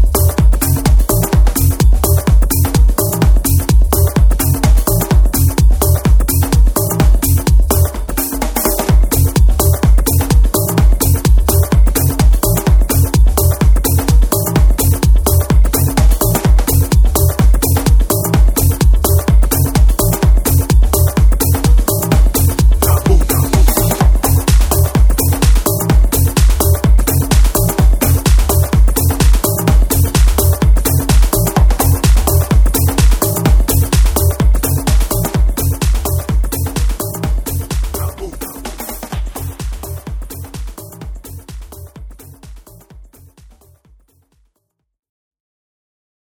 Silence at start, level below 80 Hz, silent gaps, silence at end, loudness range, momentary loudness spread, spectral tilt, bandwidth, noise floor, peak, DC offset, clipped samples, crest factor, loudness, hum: 0 s; -12 dBFS; none; 3.35 s; 8 LU; 8 LU; -5.5 dB/octave; over 20 kHz; -69 dBFS; 0 dBFS; under 0.1%; under 0.1%; 10 dB; -12 LUFS; none